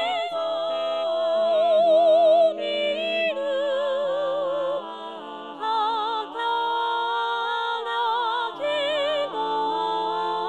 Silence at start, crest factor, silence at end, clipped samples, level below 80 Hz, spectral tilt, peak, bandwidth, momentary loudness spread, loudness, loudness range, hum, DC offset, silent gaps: 0 s; 14 dB; 0 s; under 0.1%; -82 dBFS; -3.5 dB/octave; -10 dBFS; 8.8 kHz; 9 LU; -23 LUFS; 5 LU; none; under 0.1%; none